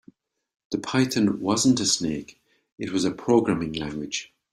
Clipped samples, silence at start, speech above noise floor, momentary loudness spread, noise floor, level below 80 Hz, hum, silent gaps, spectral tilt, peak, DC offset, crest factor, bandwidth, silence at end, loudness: under 0.1%; 0.7 s; 32 dB; 11 LU; -55 dBFS; -56 dBFS; none; 2.72-2.76 s; -4 dB/octave; -8 dBFS; under 0.1%; 18 dB; 14 kHz; 0.3 s; -24 LUFS